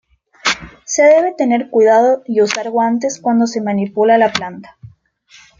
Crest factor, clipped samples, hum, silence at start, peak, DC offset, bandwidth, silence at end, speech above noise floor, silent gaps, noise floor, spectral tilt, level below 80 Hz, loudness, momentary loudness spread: 14 dB; under 0.1%; none; 0.45 s; 0 dBFS; under 0.1%; 7.6 kHz; 0.75 s; 34 dB; none; -48 dBFS; -4 dB/octave; -54 dBFS; -14 LUFS; 10 LU